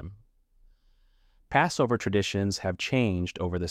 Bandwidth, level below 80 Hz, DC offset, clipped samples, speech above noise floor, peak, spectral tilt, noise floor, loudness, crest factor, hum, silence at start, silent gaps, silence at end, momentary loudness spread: 14.5 kHz; -52 dBFS; under 0.1%; under 0.1%; 36 dB; -8 dBFS; -5.5 dB/octave; -63 dBFS; -27 LUFS; 22 dB; none; 0 s; none; 0 s; 6 LU